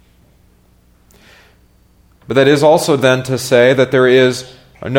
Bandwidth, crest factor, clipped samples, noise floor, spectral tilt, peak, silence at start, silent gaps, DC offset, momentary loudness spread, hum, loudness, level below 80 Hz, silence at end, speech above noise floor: 17 kHz; 14 dB; under 0.1%; -51 dBFS; -5 dB/octave; 0 dBFS; 2.3 s; none; under 0.1%; 7 LU; 60 Hz at -50 dBFS; -11 LUFS; -52 dBFS; 0 s; 39 dB